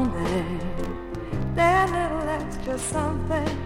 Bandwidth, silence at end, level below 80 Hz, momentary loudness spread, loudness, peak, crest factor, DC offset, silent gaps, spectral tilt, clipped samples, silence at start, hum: 16.5 kHz; 0 s; -36 dBFS; 12 LU; -26 LUFS; -8 dBFS; 18 dB; under 0.1%; none; -5.5 dB/octave; under 0.1%; 0 s; none